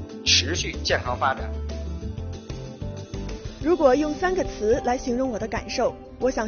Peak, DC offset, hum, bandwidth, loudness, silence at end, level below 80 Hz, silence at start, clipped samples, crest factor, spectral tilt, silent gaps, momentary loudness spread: -6 dBFS; under 0.1%; none; 7 kHz; -24 LUFS; 0 s; -38 dBFS; 0 s; under 0.1%; 18 dB; -3 dB/octave; none; 16 LU